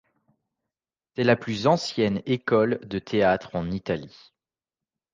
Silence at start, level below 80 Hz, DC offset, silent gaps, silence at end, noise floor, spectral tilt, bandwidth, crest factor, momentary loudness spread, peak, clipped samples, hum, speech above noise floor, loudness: 1.2 s; -56 dBFS; under 0.1%; none; 1.05 s; under -90 dBFS; -6 dB/octave; 9.4 kHz; 20 dB; 8 LU; -6 dBFS; under 0.1%; none; over 66 dB; -25 LUFS